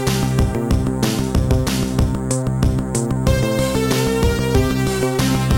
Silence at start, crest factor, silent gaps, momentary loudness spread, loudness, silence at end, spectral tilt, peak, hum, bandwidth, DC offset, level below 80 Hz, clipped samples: 0 s; 14 dB; none; 2 LU; -18 LUFS; 0 s; -5.5 dB/octave; -2 dBFS; none; 17 kHz; 0.4%; -26 dBFS; under 0.1%